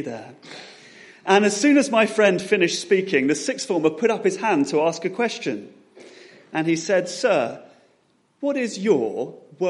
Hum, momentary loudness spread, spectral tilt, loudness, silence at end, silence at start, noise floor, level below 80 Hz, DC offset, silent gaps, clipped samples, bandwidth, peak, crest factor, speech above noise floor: none; 17 LU; -4 dB/octave; -21 LUFS; 0 s; 0 s; -63 dBFS; -74 dBFS; under 0.1%; none; under 0.1%; 11.5 kHz; -2 dBFS; 20 dB; 42 dB